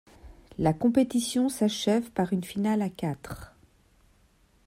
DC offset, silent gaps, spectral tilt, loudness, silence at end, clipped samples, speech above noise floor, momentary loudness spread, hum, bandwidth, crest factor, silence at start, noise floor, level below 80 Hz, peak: under 0.1%; none; -5.5 dB/octave; -27 LUFS; 1.2 s; under 0.1%; 37 dB; 14 LU; none; 16 kHz; 18 dB; 0.25 s; -63 dBFS; -56 dBFS; -10 dBFS